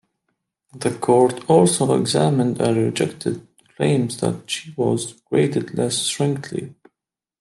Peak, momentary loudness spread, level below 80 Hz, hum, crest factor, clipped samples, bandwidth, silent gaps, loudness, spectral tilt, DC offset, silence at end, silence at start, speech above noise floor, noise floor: -2 dBFS; 11 LU; -62 dBFS; none; 18 dB; under 0.1%; 12.5 kHz; none; -20 LUFS; -5 dB/octave; under 0.1%; 0.7 s; 0.75 s; 66 dB; -85 dBFS